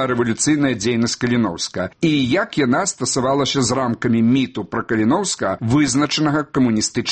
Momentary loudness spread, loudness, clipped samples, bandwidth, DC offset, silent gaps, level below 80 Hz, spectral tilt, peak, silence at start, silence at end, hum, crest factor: 4 LU; -18 LUFS; under 0.1%; 8.8 kHz; under 0.1%; none; -50 dBFS; -4.5 dB/octave; -4 dBFS; 0 s; 0 s; none; 14 dB